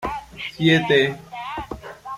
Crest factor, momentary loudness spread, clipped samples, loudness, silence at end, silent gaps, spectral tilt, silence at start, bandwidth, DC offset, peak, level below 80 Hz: 18 dB; 17 LU; under 0.1%; -20 LUFS; 0 s; none; -6 dB/octave; 0 s; 15 kHz; under 0.1%; -4 dBFS; -46 dBFS